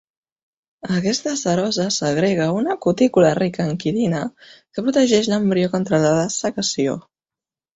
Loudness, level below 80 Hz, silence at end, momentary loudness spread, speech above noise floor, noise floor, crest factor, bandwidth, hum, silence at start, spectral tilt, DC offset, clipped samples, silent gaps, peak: -19 LUFS; -56 dBFS; 0.75 s; 8 LU; over 71 dB; under -90 dBFS; 18 dB; 8.2 kHz; none; 0.85 s; -5 dB/octave; under 0.1%; under 0.1%; none; -2 dBFS